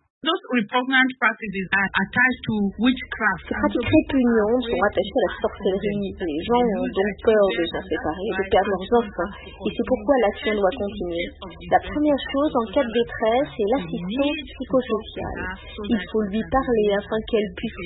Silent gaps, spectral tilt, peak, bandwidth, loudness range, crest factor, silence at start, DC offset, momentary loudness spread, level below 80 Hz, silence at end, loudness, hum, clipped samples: none; -10.5 dB/octave; -4 dBFS; 4.1 kHz; 3 LU; 18 dB; 0.25 s; under 0.1%; 9 LU; -44 dBFS; 0 s; -22 LUFS; none; under 0.1%